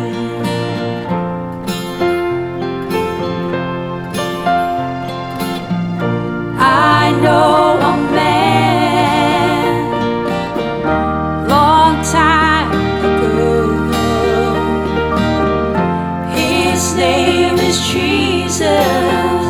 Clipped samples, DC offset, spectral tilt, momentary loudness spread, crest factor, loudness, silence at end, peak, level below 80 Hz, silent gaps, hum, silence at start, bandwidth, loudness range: under 0.1%; under 0.1%; -5 dB/octave; 10 LU; 14 dB; -14 LUFS; 0 s; 0 dBFS; -36 dBFS; none; none; 0 s; 19.5 kHz; 7 LU